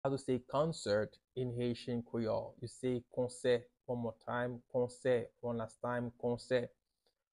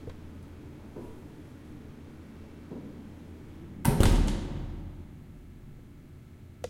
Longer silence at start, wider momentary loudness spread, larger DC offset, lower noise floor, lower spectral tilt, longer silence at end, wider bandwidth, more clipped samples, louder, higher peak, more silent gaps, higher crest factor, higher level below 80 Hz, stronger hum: about the same, 0.05 s vs 0 s; second, 6 LU vs 24 LU; neither; first, -83 dBFS vs -49 dBFS; about the same, -6 dB/octave vs -6 dB/octave; first, 0.7 s vs 0 s; second, 11.5 kHz vs 16.5 kHz; neither; second, -38 LUFS vs -31 LUFS; second, -22 dBFS vs -6 dBFS; neither; second, 16 dB vs 26 dB; second, -68 dBFS vs -36 dBFS; neither